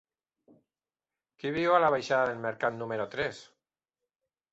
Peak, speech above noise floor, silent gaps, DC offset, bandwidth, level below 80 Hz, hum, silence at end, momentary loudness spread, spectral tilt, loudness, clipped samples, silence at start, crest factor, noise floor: -10 dBFS; over 61 dB; none; under 0.1%; 8 kHz; -68 dBFS; none; 1.1 s; 11 LU; -5.5 dB/octave; -29 LUFS; under 0.1%; 1.45 s; 22 dB; under -90 dBFS